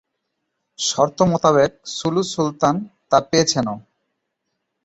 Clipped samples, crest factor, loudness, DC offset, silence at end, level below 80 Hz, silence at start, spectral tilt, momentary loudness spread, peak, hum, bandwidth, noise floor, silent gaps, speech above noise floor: under 0.1%; 20 dB; -19 LUFS; under 0.1%; 1.05 s; -54 dBFS; 0.8 s; -4.5 dB/octave; 9 LU; -2 dBFS; none; 8.2 kHz; -76 dBFS; none; 58 dB